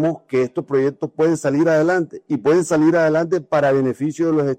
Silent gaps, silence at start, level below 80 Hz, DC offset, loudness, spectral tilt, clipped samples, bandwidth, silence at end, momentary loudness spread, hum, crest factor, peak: none; 0 s; -60 dBFS; under 0.1%; -18 LUFS; -7 dB/octave; under 0.1%; 9.6 kHz; 0.05 s; 6 LU; none; 12 dB; -6 dBFS